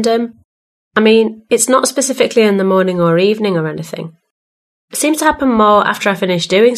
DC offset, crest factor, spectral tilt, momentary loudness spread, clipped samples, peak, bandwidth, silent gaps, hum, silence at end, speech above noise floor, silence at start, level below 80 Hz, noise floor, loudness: under 0.1%; 14 dB; -4 dB/octave; 13 LU; under 0.1%; 0 dBFS; 13.5 kHz; 0.45-0.91 s, 4.31-4.88 s; none; 0 s; over 78 dB; 0 s; -48 dBFS; under -90 dBFS; -13 LUFS